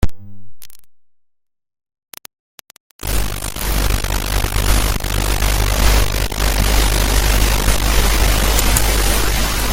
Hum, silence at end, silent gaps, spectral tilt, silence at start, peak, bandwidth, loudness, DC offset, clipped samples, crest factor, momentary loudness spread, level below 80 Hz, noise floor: none; 0 s; 2.39-2.58 s, 2.80-2.99 s; -3 dB/octave; 0 s; 0 dBFS; 17 kHz; -17 LUFS; under 0.1%; under 0.1%; 16 dB; 8 LU; -18 dBFS; -65 dBFS